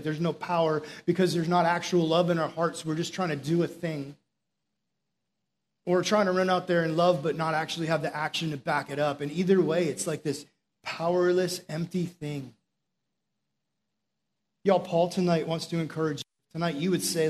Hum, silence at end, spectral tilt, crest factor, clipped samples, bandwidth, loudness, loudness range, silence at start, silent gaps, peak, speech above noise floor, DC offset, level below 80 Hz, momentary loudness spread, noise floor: none; 0 s; -5.5 dB/octave; 18 dB; under 0.1%; 13.5 kHz; -28 LUFS; 6 LU; 0 s; none; -10 dBFS; 57 dB; under 0.1%; -72 dBFS; 10 LU; -84 dBFS